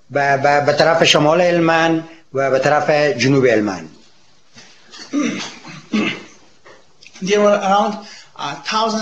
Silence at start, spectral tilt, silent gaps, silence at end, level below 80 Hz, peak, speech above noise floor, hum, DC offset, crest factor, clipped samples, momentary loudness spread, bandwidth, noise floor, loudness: 0.1 s; -4.5 dB/octave; none; 0 s; -64 dBFS; 0 dBFS; 39 dB; none; 0.4%; 16 dB; under 0.1%; 16 LU; 12 kHz; -54 dBFS; -16 LUFS